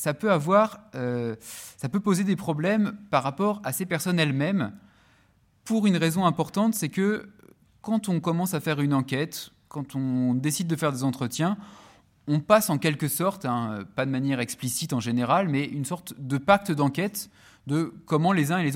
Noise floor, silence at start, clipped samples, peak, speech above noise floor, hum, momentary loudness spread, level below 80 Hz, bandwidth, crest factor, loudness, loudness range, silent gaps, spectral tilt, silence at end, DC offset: -63 dBFS; 0 s; under 0.1%; -6 dBFS; 37 dB; none; 11 LU; -66 dBFS; 16.5 kHz; 20 dB; -26 LUFS; 2 LU; none; -5.5 dB/octave; 0 s; under 0.1%